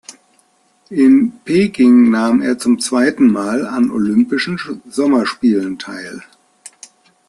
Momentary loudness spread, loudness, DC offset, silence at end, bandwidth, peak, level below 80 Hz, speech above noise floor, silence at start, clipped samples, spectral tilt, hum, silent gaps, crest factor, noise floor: 14 LU; -14 LUFS; under 0.1%; 1.05 s; 12 kHz; -2 dBFS; -56 dBFS; 43 dB; 0.1 s; under 0.1%; -5.5 dB/octave; none; none; 12 dB; -57 dBFS